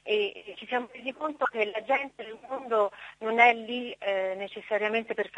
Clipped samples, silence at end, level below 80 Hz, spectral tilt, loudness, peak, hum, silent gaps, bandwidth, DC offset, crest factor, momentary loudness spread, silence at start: under 0.1%; 0 s; -74 dBFS; -4 dB/octave; -28 LUFS; -6 dBFS; none; none; 9.2 kHz; under 0.1%; 22 dB; 16 LU; 0.05 s